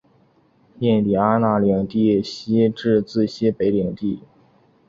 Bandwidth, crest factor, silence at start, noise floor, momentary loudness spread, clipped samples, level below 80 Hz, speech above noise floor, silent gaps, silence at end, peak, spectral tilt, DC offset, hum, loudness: 7.4 kHz; 16 dB; 0.8 s; -58 dBFS; 7 LU; under 0.1%; -52 dBFS; 39 dB; none; 0.7 s; -4 dBFS; -8 dB/octave; under 0.1%; none; -20 LUFS